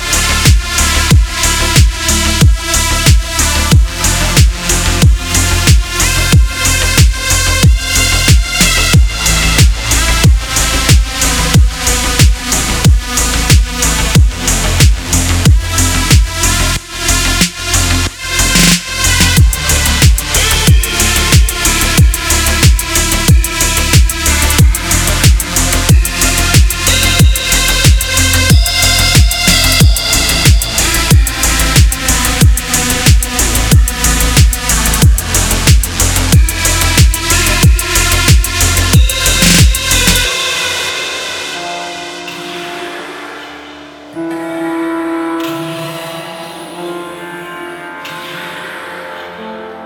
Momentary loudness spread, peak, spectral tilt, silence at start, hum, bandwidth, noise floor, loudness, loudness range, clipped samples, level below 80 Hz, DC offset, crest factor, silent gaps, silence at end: 14 LU; 0 dBFS; -3 dB/octave; 0 s; none; over 20 kHz; -31 dBFS; -10 LUFS; 11 LU; 0.1%; -14 dBFS; under 0.1%; 10 dB; none; 0 s